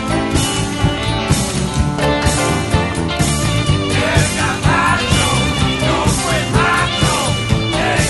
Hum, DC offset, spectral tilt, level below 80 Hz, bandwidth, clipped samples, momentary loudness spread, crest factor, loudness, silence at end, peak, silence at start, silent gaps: none; under 0.1%; -4 dB/octave; -26 dBFS; 12 kHz; under 0.1%; 3 LU; 14 dB; -15 LUFS; 0 s; 0 dBFS; 0 s; none